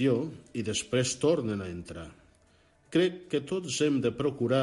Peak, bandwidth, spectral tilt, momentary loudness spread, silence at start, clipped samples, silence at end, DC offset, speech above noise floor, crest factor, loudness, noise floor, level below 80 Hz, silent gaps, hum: -12 dBFS; 11.5 kHz; -5 dB/octave; 13 LU; 0 s; under 0.1%; 0 s; under 0.1%; 35 dB; 16 dB; -30 LUFS; -64 dBFS; -58 dBFS; none; none